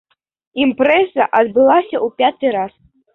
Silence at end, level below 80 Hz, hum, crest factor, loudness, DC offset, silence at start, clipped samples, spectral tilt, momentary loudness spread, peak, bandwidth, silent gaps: 0.45 s; -58 dBFS; none; 14 dB; -15 LUFS; under 0.1%; 0.55 s; under 0.1%; -7 dB/octave; 10 LU; -2 dBFS; 4.1 kHz; none